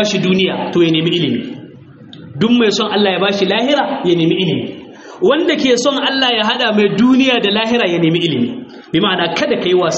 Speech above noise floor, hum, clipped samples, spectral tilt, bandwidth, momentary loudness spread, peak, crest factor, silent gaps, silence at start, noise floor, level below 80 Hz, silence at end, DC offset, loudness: 23 dB; none; under 0.1%; -3.5 dB/octave; 8 kHz; 8 LU; 0 dBFS; 14 dB; none; 0 s; -37 dBFS; -56 dBFS; 0 s; under 0.1%; -14 LUFS